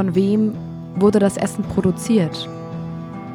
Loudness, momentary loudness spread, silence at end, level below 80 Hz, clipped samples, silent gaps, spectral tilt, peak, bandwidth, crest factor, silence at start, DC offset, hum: -19 LUFS; 14 LU; 0 s; -50 dBFS; under 0.1%; none; -6.5 dB/octave; -4 dBFS; 15 kHz; 16 dB; 0 s; under 0.1%; none